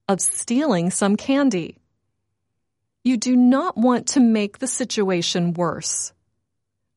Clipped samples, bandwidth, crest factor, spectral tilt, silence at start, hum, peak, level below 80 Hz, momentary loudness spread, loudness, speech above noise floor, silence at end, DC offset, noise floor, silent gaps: under 0.1%; 11.5 kHz; 16 dB; -4.5 dB/octave; 0.1 s; none; -6 dBFS; -66 dBFS; 8 LU; -20 LUFS; 59 dB; 0.9 s; under 0.1%; -79 dBFS; none